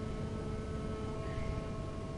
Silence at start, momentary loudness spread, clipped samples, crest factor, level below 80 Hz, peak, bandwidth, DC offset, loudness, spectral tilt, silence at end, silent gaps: 0 s; 1 LU; under 0.1%; 14 dB; -44 dBFS; -26 dBFS; 10.5 kHz; under 0.1%; -40 LUFS; -7 dB/octave; 0 s; none